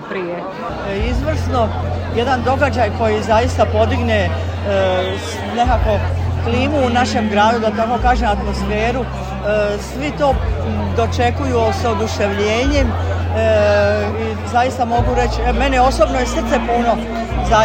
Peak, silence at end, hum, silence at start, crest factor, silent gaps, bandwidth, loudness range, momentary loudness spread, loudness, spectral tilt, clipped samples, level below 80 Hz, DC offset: 0 dBFS; 0 s; none; 0 s; 16 dB; none; 15.5 kHz; 2 LU; 7 LU; -17 LUFS; -6 dB/octave; under 0.1%; -26 dBFS; under 0.1%